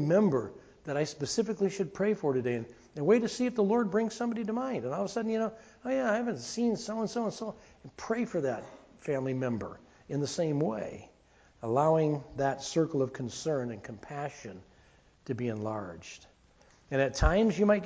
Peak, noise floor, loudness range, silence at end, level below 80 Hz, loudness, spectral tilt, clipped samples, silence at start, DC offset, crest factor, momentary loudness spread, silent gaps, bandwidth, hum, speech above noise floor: -10 dBFS; -62 dBFS; 5 LU; 0 s; -48 dBFS; -31 LUFS; -6 dB/octave; under 0.1%; 0 s; under 0.1%; 20 dB; 17 LU; none; 8 kHz; none; 32 dB